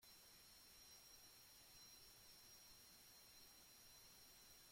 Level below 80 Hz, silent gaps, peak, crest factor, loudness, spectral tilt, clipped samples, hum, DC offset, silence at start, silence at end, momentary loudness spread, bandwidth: -82 dBFS; none; -54 dBFS; 14 dB; -64 LUFS; -0.5 dB/octave; under 0.1%; none; under 0.1%; 0 s; 0 s; 2 LU; 16.5 kHz